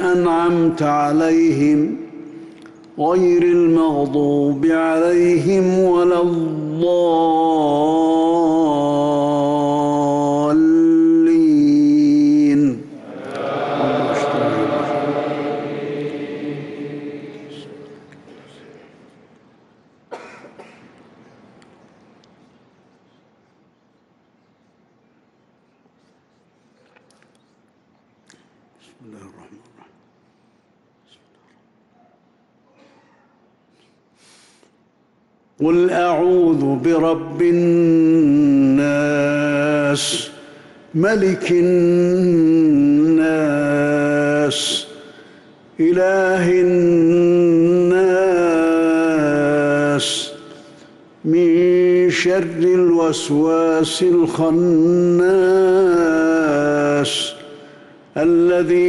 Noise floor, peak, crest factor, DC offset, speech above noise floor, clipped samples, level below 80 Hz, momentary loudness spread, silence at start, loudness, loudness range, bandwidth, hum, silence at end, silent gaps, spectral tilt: -59 dBFS; -8 dBFS; 10 dB; under 0.1%; 44 dB; under 0.1%; -56 dBFS; 12 LU; 0 s; -16 LUFS; 7 LU; 12 kHz; none; 0 s; none; -6 dB/octave